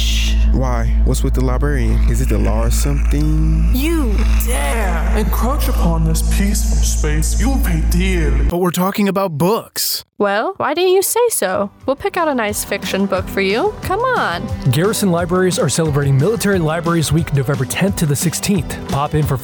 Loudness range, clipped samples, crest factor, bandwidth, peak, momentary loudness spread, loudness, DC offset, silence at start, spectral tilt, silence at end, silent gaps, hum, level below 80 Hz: 1 LU; under 0.1%; 10 dB; over 20 kHz; -6 dBFS; 3 LU; -17 LUFS; under 0.1%; 0 s; -5 dB/octave; 0 s; none; none; -18 dBFS